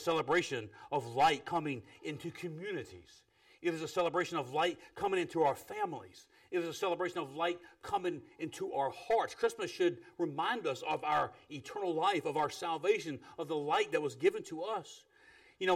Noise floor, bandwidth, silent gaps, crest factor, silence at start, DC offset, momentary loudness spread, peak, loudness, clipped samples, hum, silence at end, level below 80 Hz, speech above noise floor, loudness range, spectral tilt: -63 dBFS; 16 kHz; none; 18 dB; 0 s; under 0.1%; 11 LU; -18 dBFS; -35 LUFS; under 0.1%; none; 0 s; -74 dBFS; 27 dB; 3 LU; -4.5 dB/octave